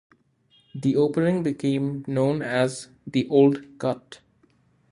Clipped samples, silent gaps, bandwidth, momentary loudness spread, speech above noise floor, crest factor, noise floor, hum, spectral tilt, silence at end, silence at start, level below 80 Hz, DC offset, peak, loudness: under 0.1%; none; 11 kHz; 10 LU; 39 dB; 18 dB; -62 dBFS; none; -7 dB/octave; 0.75 s; 0.75 s; -64 dBFS; under 0.1%; -6 dBFS; -24 LUFS